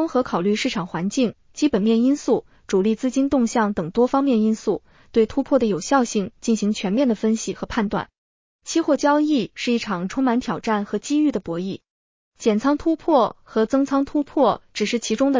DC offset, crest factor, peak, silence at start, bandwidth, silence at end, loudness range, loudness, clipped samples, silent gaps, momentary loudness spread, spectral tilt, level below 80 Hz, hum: under 0.1%; 16 dB; -4 dBFS; 0 s; 7.6 kHz; 0 s; 2 LU; -21 LUFS; under 0.1%; 8.18-8.59 s, 11.90-12.32 s; 6 LU; -5.5 dB/octave; -52 dBFS; none